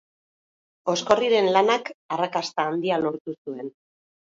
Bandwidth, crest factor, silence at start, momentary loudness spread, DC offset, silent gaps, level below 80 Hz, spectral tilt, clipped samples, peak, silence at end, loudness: 7.8 kHz; 22 dB; 0.85 s; 15 LU; under 0.1%; 1.94-2.09 s, 3.20-3.25 s, 3.38-3.45 s; -68 dBFS; -4 dB/octave; under 0.1%; -4 dBFS; 0.65 s; -23 LUFS